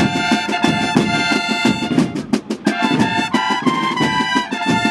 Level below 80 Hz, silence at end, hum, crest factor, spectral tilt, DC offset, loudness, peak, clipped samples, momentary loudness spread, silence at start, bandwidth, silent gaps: -50 dBFS; 0 s; none; 16 dB; -4.5 dB/octave; under 0.1%; -17 LUFS; 0 dBFS; under 0.1%; 3 LU; 0 s; 13 kHz; none